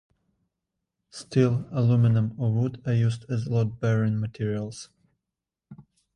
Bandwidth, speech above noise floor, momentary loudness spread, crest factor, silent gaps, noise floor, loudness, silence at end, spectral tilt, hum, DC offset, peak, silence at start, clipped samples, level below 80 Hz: 10 kHz; 63 dB; 12 LU; 18 dB; none; -87 dBFS; -25 LUFS; 0.35 s; -8 dB/octave; none; under 0.1%; -8 dBFS; 1.15 s; under 0.1%; -58 dBFS